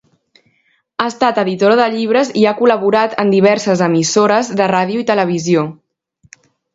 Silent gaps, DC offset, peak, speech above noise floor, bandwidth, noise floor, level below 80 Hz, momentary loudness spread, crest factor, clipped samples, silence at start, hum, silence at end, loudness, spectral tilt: none; under 0.1%; 0 dBFS; 47 dB; 8 kHz; -60 dBFS; -60 dBFS; 4 LU; 14 dB; under 0.1%; 1 s; none; 1 s; -13 LUFS; -5 dB/octave